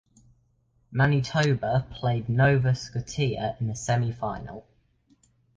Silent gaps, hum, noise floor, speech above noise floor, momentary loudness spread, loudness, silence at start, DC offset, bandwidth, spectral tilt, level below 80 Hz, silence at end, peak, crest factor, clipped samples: none; none; -67 dBFS; 42 dB; 11 LU; -26 LUFS; 0.9 s; under 0.1%; 9.2 kHz; -6 dB/octave; -50 dBFS; 0.95 s; -8 dBFS; 18 dB; under 0.1%